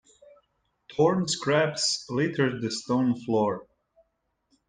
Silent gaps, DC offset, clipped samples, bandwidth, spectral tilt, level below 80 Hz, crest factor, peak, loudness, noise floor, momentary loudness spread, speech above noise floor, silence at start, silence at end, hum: none; under 0.1%; under 0.1%; 10 kHz; -4.5 dB/octave; -66 dBFS; 18 dB; -10 dBFS; -26 LUFS; -76 dBFS; 6 LU; 50 dB; 0.9 s; 1.05 s; none